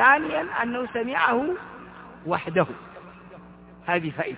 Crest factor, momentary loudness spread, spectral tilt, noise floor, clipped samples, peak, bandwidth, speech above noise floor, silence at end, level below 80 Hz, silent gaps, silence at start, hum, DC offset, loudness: 22 dB; 23 LU; -9 dB/octave; -47 dBFS; under 0.1%; -4 dBFS; 4 kHz; 23 dB; 0 s; -60 dBFS; none; 0 s; none; under 0.1%; -25 LUFS